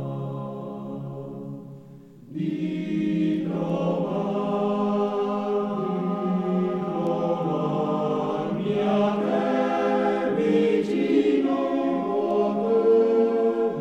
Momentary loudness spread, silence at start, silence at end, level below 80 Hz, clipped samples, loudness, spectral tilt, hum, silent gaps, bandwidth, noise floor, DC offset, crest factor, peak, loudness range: 13 LU; 0 s; 0 s; -66 dBFS; under 0.1%; -24 LUFS; -8.5 dB/octave; none; none; 8.4 kHz; -46 dBFS; under 0.1%; 14 dB; -10 dBFS; 6 LU